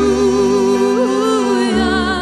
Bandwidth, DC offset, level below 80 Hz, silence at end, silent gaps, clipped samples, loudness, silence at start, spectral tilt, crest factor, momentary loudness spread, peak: 12.5 kHz; under 0.1%; -36 dBFS; 0 s; none; under 0.1%; -14 LUFS; 0 s; -4.5 dB/octave; 12 dB; 1 LU; -2 dBFS